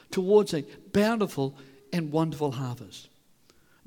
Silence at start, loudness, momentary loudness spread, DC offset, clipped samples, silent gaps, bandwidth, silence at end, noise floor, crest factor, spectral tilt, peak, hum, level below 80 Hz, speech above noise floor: 0.1 s; -27 LUFS; 15 LU; under 0.1%; under 0.1%; none; 18.5 kHz; 0.8 s; -61 dBFS; 20 dB; -6.5 dB/octave; -8 dBFS; none; -64 dBFS; 34 dB